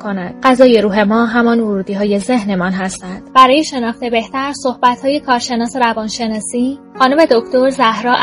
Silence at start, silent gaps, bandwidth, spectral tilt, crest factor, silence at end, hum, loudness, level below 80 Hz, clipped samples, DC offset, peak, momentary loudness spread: 0 s; none; 11 kHz; -4.5 dB/octave; 14 dB; 0 s; none; -13 LUFS; -48 dBFS; 0.4%; under 0.1%; 0 dBFS; 10 LU